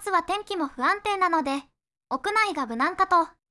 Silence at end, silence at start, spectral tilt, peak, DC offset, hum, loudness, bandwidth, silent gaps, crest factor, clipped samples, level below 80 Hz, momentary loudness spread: 0.2 s; 0 s; -2.5 dB/octave; -10 dBFS; under 0.1%; none; -25 LUFS; 12 kHz; none; 16 dB; under 0.1%; -60 dBFS; 9 LU